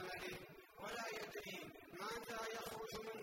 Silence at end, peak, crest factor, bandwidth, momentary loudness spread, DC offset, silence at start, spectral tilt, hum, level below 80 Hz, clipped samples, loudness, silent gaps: 0 s; -34 dBFS; 16 dB; 16 kHz; 7 LU; under 0.1%; 0 s; -3 dB/octave; none; -74 dBFS; under 0.1%; -49 LUFS; none